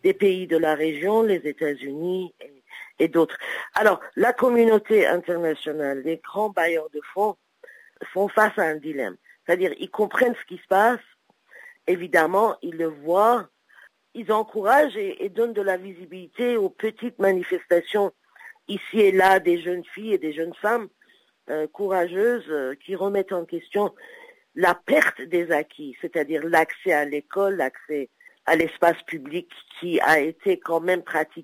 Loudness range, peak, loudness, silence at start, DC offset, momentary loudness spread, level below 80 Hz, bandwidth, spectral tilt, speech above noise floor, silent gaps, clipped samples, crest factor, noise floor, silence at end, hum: 4 LU; -6 dBFS; -23 LUFS; 0.05 s; under 0.1%; 13 LU; -72 dBFS; 16 kHz; -5 dB/octave; 38 dB; none; under 0.1%; 18 dB; -61 dBFS; 0 s; none